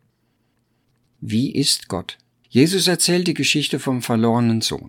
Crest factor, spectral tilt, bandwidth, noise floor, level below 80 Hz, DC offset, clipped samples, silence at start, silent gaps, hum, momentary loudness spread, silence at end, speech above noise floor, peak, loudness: 18 dB; -4 dB/octave; 18.5 kHz; -66 dBFS; -58 dBFS; under 0.1%; under 0.1%; 1.2 s; none; none; 11 LU; 0.1 s; 48 dB; -2 dBFS; -19 LUFS